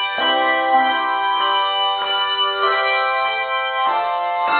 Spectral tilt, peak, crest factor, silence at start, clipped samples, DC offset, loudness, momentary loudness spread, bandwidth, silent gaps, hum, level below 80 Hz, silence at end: -4.5 dB/octave; -4 dBFS; 14 dB; 0 s; under 0.1%; under 0.1%; -17 LUFS; 4 LU; 4.6 kHz; none; none; -64 dBFS; 0 s